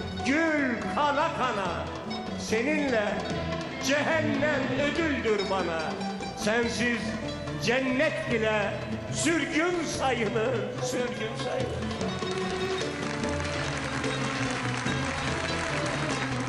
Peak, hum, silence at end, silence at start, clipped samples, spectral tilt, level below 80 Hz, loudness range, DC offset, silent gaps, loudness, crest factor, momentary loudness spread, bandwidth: -12 dBFS; none; 0 s; 0 s; under 0.1%; -4.5 dB/octave; -50 dBFS; 3 LU; under 0.1%; none; -28 LUFS; 16 dB; 6 LU; 12.5 kHz